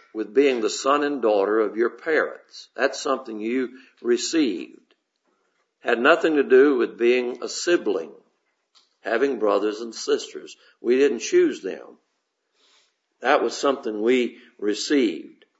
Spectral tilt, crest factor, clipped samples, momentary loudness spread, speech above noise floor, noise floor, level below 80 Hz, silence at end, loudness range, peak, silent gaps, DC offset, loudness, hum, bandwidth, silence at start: -3 dB/octave; 22 dB; under 0.1%; 14 LU; 53 dB; -75 dBFS; -84 dBFS; 0.3 s; 5 LU; -2 dBFS; none; under 0.1%; -22 LUFS; none; 8 kHz; 0.15 s